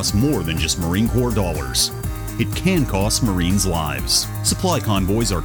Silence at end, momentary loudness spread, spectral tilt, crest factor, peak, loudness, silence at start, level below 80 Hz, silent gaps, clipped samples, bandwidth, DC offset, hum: 0 s; 4 LU; -4 dB/octave; 16 dB; -4 dBFS; -19 LUFS; 0 s; -30 dBFS; none; under 0.1%; over 20 kHz; under 0.1%; none